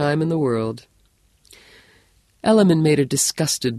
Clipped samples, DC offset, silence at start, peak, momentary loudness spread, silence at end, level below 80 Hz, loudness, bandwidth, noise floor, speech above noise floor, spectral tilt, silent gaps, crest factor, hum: under 0.1%; under 0.1%; 0 s; -2 dBFS; 10 LU; 0 s; -58 dBFS; -19 LUFS; 13 kHz; -60 dBFS; 41 dB; -5 dB/octave; none; 18 dB; none